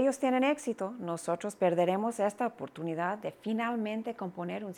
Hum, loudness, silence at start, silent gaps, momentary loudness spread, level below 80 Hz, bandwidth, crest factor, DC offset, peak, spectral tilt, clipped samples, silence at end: none; -32 LUFS; 0 s; none; 9 LU; -80 dBFS; 15 kHz; 16 dB; under 0.1%; -16 dBFS; -5.5 dB/octave; under 0.1%; 0 s